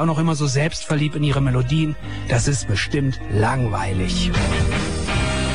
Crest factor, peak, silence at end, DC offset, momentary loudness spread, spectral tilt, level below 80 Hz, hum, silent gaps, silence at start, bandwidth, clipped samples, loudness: 12 dB; -8 dBFS; 0 s; 2%; 3 LU; -5.5 dB/octave; -30 dBFS; none; none; 0 s; 10.5 kHz; under 0.1%; -21 LUFS